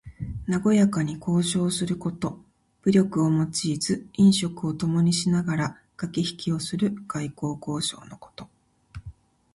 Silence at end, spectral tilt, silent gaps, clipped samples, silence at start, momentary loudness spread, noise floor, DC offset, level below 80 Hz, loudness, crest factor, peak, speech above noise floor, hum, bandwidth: 0.45 s; -5.5 dB/octave; none; under 0.1%; 0.05 s; 16 LU; -46 dBFS; under 0.1%; -52 dBFS; -25 LUFS; 18 dB; -8 dBFS; 22 dB; none; 11.5 kHz